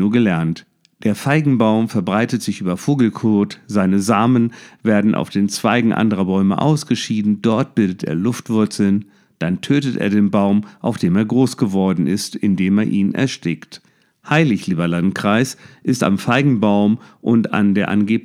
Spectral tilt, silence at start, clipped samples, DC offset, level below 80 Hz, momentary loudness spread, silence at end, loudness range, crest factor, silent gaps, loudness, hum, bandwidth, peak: -6.5 dB/octave; 0 s; under 0.1%; under 0.1%; -58 dBFS; 7 LU; 0.05 s; 2 LU; 16 dB; none; -17 LUFS; none; 14.5 kHz; 0 dBFS